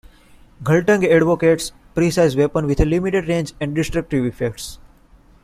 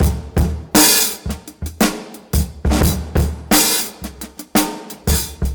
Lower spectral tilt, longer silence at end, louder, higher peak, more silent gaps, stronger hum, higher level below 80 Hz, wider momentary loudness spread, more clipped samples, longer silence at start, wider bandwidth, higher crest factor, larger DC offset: first, -6 dB/octave vs -3.5 dB/octave; first, 0.7 s vs 0 s; about the same, -18 LUFS vs -16 LUFS; about the same, -2 dBFS vs 0 dBFS; neither; neither; second, -34 dBFS vs -24 dBFS; second, 11 LU vs 17 LU; neither; first, 0.6 s vs 0 s; second, 15.5 kHz vs over 20 kHz; about the same, 16 dB vs 18 dB; neither